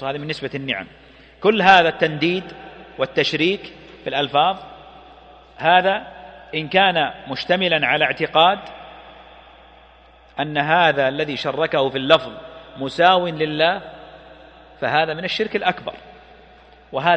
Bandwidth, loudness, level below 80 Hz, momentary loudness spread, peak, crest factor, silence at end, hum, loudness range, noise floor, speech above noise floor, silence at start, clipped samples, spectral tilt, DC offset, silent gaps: 8.6 kHz; -19 LUFS; -54 dBFS; 21 LU; 0 dBFS; 20 dB; 0 s; none; 4 LU; -49 dBFS; 30 dB; 0 s; under 0.1%; -5.5 dB/octave; under 0.1%; none